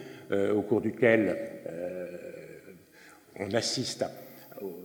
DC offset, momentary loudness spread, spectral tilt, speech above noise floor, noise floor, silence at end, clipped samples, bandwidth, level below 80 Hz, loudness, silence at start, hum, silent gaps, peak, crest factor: under 0.1%; 22 LU; -4.5 dB/octave; 27 dB; -55 dBFS; 0 s; under 0.1%; over 20 kHz; -74 dBFS; -30 LUFS; 0 s; none; none; -8 dBFS; 22 dB